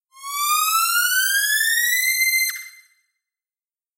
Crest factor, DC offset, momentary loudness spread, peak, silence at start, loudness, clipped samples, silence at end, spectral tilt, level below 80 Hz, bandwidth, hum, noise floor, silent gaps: 14 dB; under 0.1%; 7 LU; -8 dBFS; 0.15 s; -17 LUFS; under 0.1%; 1.25 s; 15 dB/octave; under -90 dBFS; 16 kHz; none; under -90 dBFS; none